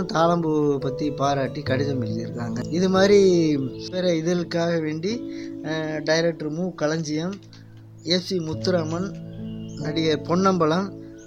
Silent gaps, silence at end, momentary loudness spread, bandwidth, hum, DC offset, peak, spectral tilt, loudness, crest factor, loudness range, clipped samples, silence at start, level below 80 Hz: none; 0 s; 13 LU; 10 kHz; none; under 0.1%; -4 dBFS; -6 dB/octave; -23 LUFS; 18 dB; 5 LU; under 0.1%; 0 s; -54 dBFS